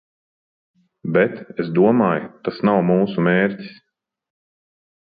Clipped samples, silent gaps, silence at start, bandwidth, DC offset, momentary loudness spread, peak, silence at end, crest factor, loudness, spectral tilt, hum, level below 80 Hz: under 0.1%; none; 1.05 s; 5 kHz; under 0.1%; 13 LU; -2 dBFS; 1.4 s; 18 dB; -19 LUFS; -11 dB/octave; none; -62 dBFS